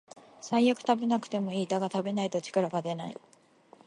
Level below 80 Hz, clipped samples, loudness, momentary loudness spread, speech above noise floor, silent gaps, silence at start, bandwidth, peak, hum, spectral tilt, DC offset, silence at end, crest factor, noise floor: -80 dBFS; under 0.1%; -30 LUFS; 12 LU; 30 dB; none; 0.4 s; 11 kHz; -12 dBFS; none; -5.5 dB/octave; under 0.1%; 0.75 s; 20 dB; -59 dBFS